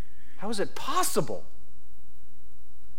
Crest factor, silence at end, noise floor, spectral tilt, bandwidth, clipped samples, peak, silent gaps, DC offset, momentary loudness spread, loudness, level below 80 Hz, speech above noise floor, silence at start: 22 dB; 0.5 s; -57 dBFS; -3.5 dB/octave; 16.5 kHz; under 0.1%; -12 dBFS; none; 8%; 13 LU; -31 LUFS; -58 dBFS; 27 dB; 0.25 s